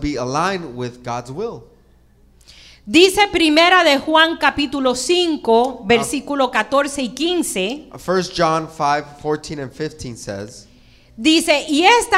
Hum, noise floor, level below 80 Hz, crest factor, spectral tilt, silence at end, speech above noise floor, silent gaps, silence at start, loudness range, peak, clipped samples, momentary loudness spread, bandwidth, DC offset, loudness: none; -51 dBFS; -44 dBFS; 18 dB; -3.5 dB/octave; 0 s; 34 dB; none; 0 s; 8 LU; 0 dBFS; under 0.1%; 16 LU; 16 kHz; under 0.1%; -16 LUFS